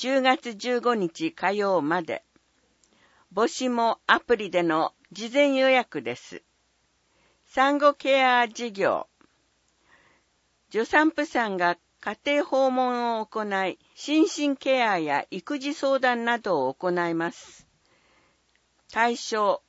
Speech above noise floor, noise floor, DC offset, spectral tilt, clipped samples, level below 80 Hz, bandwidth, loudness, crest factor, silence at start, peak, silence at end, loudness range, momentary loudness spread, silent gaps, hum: 45 dB; -69 dBFS; under 0.1%; -4 dB/octave; under 0.1%; -70 dBFS; 8 kHz; -25 LUFS; 22 dB; 0 s; -4 dBFS; 0.1 s; 4 LU; 11 LU; none; none